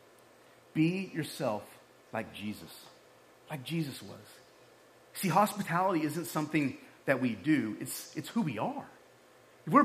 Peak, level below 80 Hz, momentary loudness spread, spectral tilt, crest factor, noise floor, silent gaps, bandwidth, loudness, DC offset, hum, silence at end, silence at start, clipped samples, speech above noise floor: -12 dBFS; -80 dBFS; 17 LU; -5.5 dB/octave; 22 dB; -60 dBFS; none; 15.5 kHz; -33 LUFS; under 0.1%; none; 0 s; 0.75 s; under 0.1%; 27 dB